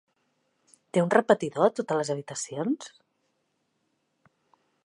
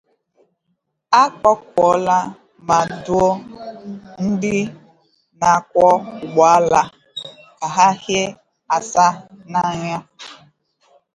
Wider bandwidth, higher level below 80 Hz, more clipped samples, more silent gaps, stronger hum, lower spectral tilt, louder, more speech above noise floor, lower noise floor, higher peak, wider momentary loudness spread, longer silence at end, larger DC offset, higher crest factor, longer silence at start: about the same, 11.5 kHz vs 11 kHz; second, -78 dBFS vs -52 dBFS; neither; neither; neither; about the same, -5 dB/octave vs -4.5 dB/octave; second, -26 LUFS vs -17 LUFS; second, 50 dB vs 55 dB; first, -76 dBFS vs -71 dBFS; second, -6 dBFS vs 0 dBFS; second, 11 LU vs 20 LU; first, 1.95 s vs 0.8 s; neither; first, 24 dB vs 18 dB; second, 0.95 s vs 1.1 s